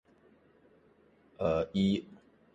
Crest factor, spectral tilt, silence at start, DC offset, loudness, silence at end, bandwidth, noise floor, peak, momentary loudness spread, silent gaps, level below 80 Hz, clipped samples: 18 dB; -7.5 dB/octave; 1.4 s; under 0.1%; -32 LUFS; 0.4 s; 7.8 kHz; -65 dBFS; -18 dBFS; 8 LU; none; -58 dBFS; under 0.1%